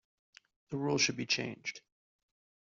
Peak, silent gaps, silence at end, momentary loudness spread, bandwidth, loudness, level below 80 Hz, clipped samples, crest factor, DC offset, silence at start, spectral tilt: -16 dBFS; none; 0.85 s; 13 LU; 8 kHz; -33 LUFS; -76 dBFS; under 0.1%; 22 dB; under 0.1%; 0.7 s; -3 dB/octave